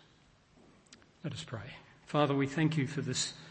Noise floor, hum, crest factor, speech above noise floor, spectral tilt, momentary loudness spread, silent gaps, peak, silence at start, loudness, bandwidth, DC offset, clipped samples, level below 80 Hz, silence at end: -65 dBFS; none; 22 dB; 31 dB; -5 dB/octave; 15 LU; none; -14 dBFS; 0.9 s; -34 LUFS; 8.8 kHz; under 0.1%; under 0.1%; -70 dBFS; 0 s